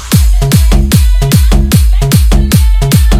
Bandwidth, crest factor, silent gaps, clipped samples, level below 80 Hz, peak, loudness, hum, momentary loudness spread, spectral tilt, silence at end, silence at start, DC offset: 16 kHz; 6 dB; none; 3%; -8 dBFS; 0 dBFS; -9 LUFS; none; 1 LU; -5.5 dB/octave; 0 s; 0 s; under 0.1%